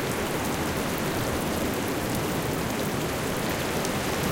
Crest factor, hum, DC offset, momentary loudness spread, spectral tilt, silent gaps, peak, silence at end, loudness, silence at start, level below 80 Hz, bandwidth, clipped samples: 16 dB; none; under 0.1%; 1 LU; -4.5 dB/octave; none; -10 dBFS; 0 s; -28 LUFS; 0 s; -44 dBFS; 17 kHz; under 0.1%